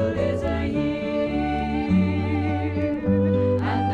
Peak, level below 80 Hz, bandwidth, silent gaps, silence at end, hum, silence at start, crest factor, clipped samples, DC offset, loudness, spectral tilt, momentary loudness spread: -10 dBFS; -38 dBFS; 7.8 kHz; none; 0 s; none; 0 s; 12 dB; under 0.1%; under 0.1%; -23 LUFS; -9 dB/octave; 4 LU